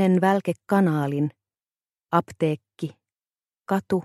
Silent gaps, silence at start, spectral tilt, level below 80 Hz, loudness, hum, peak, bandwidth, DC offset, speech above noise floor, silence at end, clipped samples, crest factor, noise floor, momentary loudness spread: none; 0 s; -8 dB/octave; -68 dBFS; -24 LUFS; none; -6 dBFS; 13 kHz; under 0.1%; over 67 dB; 0 s; under 0.1%; 18 dB; under -90 dBFS; 15 LU